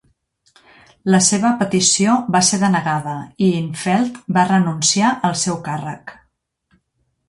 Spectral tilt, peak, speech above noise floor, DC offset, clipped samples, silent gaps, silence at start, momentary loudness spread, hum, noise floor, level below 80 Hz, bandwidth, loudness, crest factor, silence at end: -4 dB/octave; -2 dBFS; 52 dB; under 0.1%; under 0.1%; none; 1.05 s; 12 LU; none; -69 dBFS; -58 dBFS; 11.5 kHz; -16 LUFS; 16 dB; 1.15 s